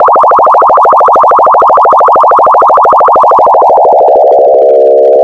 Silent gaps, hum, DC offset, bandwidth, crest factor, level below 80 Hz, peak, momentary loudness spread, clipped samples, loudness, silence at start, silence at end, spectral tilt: none; none; under 0.1%; 8.2 kHz; 4 dB; -46 dBFS; 0 dBFS; 0 LU; 4%; -4 LUFS; 0 s; 0 s; -6 dB/octave